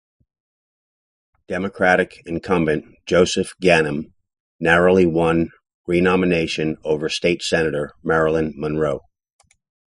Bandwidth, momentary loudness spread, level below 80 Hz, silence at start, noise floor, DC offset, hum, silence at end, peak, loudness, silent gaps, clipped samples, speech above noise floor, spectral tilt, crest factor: 11.5 kHz; 11 LU; -44 dBFS; 1.5 s; under -90 dBFS; under 0.1%; none; 0.9 s; 0 dBFS; -19 LUFS; 4.40-4.59 s, 5.74-5.84 s; under 0.1%; over 71 dB; -5.5 dB/octave; 20 dB